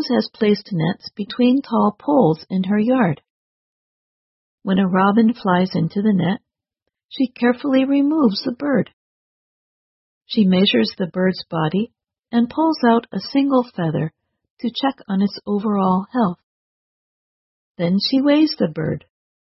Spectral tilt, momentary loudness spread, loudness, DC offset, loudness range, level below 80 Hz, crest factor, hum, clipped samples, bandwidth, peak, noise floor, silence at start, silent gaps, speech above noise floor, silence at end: -9.5 dB/octave; 9 LU; -19 LUFS; under 0.1%; 3 LU; -60 dBFS; 16 dB; none; under 0.1%; 6 kHz; -4 dBFS; under -90 dBFS; 0 s; 3.30-4.58 s, 7.05-7.09 s, 8.93-10.21 s, 14.50-14.57 s, 16.43-17.75 s; over 72 dB; 0.5 s